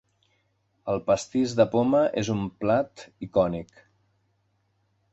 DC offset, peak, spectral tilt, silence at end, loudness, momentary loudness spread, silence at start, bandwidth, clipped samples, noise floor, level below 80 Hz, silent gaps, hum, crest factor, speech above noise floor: under 0.1%; -6 dBFS; -6.5 dB/octave; 1.5 s; -25 LUFS; 13 LU; 0.85 s; 8.2 kHz; under 0.1%; -71 dBFS; -56 dBFS; none; none; 20 dB; 46 dB